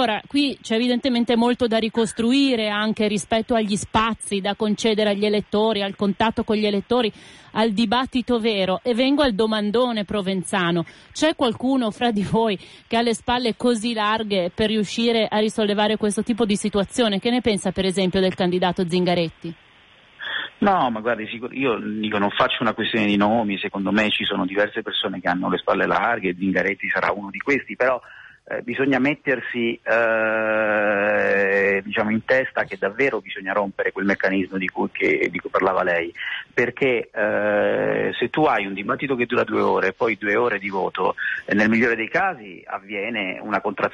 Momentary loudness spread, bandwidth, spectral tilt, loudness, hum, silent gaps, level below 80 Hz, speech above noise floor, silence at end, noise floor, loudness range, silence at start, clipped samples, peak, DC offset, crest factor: 6 LU; 11.5 kHz; -5 dB/octave; -21 LUFS; none; none; -52 dBFS; 31 dB; 0 s; -52 dBFS; 2 LU; 0 s; under 0.1%; -8 dBFS; under 0.1%; 14 dB